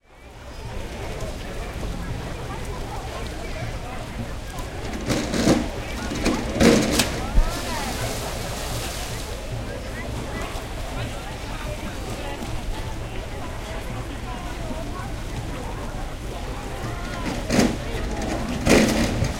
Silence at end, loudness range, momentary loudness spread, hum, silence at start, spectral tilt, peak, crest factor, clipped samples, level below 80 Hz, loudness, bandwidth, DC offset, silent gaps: 0 s; 10 LU; 12 LU; none; 0.1 s; -4.5 dB/octave; -2 dBFS; 24 dB; under 0.1%; -32 dBFS; -26 LUFS; 16.5 kHz; under 0.1%; none